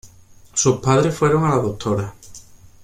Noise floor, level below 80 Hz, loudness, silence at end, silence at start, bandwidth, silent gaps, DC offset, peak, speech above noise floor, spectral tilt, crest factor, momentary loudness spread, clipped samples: -46 dBFS; -48 dBFS; -19 LUFS; 0.45 s; 0.05 s; 15 kHz; none; under 0.1%; -2 dBFS; 29 dB; -5.5 dB/octave; 18 dB; 9 LU; under 0.1%